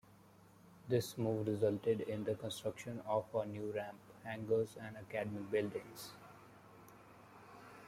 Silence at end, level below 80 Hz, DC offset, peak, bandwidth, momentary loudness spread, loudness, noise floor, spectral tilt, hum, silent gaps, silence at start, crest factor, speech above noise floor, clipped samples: 0 s; -76 dBFS; under 0.1%; -22 dBFS; 16 kHz; 23 LU; -40 LUFS; -63 dBFS; -6 dB/octave; none; none; 0.05 s; 20 dB; 24 dB; under 0.1%